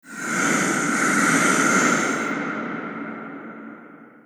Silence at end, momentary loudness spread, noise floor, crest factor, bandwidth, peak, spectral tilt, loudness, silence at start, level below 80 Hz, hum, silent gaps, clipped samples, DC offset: 0.15 s; 19 LU; -45 dBFS; 18 dB; over 20 kHz; -6 dBFS; -3 dB/octave; -20 LUFS; 0.05 s; -76 dBFS; none; none; under 0.1%; under 0.1%